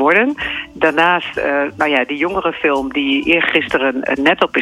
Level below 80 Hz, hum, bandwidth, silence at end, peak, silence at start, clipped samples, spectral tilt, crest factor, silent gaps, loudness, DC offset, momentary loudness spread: -48 dBFS; none; 12 kHz; 0 s; -2 dBFS; 0 s; under 0.1%; -5 dB/octave; 14 dB; none; -15 LUFS; under 0.1%; 5 LU